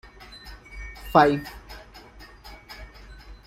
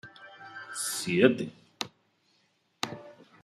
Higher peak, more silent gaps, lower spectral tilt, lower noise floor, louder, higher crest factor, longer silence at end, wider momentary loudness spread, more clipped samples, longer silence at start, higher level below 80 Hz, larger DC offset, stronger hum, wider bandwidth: first, -2 dBFS vs -8 dBFS; neither; first, -6.5 dB/octave vs -4 dB/octave; second, -47 dBFS vs -71 dBFS; first, -21 LUFS vs -30 LUFS; about the same, 26 dB vs 26 dB; second, 0.15 s vs 0.3 s; first, 28 LU vs 22 LU; neither; first, 0.45 s vs 0.05 s; first, -46 dBFS vs -74 dBFS; neither; neither; first, 16.5 kHz vs 14.5 kHz